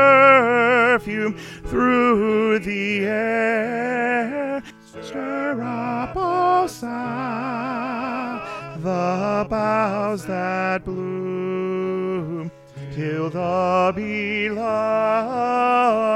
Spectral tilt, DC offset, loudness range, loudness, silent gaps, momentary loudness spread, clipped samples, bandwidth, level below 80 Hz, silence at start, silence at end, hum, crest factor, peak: -6.5 dB/octave; under 0.1%; 5 LU; -21 LUFS; none; 12 LU; under 0.1%; 13.5 kHz; -50 dBFS; 0 s; 0 s; none; 20 dB; -2 dBFS